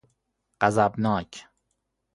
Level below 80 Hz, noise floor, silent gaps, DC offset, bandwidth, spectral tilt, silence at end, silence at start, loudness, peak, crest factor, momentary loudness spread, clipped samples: -56 dBFS; -77 dBFS; none; under 0.1%; 11.5 kHz; -6 dB/octave; 0.75 s; 0.6 s; -24 LUFS; -4 dBFS; 24 dB; 20 LU; under 0.1%